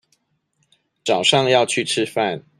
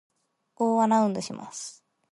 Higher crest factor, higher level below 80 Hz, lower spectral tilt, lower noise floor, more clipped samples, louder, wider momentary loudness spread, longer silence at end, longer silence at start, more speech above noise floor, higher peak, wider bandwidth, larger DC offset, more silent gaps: about the same, 20 dB vs 16 dB; first, -66 dBFS vs -76 dBFS; second, -3 dB/octave vs -5.5 dB/octave; about the same, -68 dBFS vs -66 dBFS; neither; first, -18 LUFS vs -25 LUFS; second, 7 LU vs 16 LU; second, 0.2 s vs 0.4 s; first, 1.05 s vs 0.6 s; first, 49 dB vs 40 dB; first, -2 dBFS vs -10 dBFS; first, 14.5 kHz vs 11.5 kHz; neither; neither